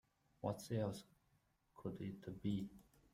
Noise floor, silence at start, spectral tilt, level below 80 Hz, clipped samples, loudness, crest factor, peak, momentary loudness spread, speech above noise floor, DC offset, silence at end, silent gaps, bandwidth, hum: -79 dBFS; 0.45 s; -7 dB/octave; -72 dBFS; under 0.1%; -47 LUFS; 20 dB; -28 dBFS; 9 LU; 35 dB; under 0.1%; 0.3 s; none; 16 kHz; none